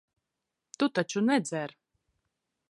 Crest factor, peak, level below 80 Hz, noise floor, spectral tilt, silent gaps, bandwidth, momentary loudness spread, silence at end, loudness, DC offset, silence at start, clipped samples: 22 dB; -12 dBFS; -80 dBFS; -86 dBFS; -4.5 dB/octave; none; 11.5 kHz; 10 LU; 1 s; -29 LUFS; under 0.1%; 0.8 s; under 0.1%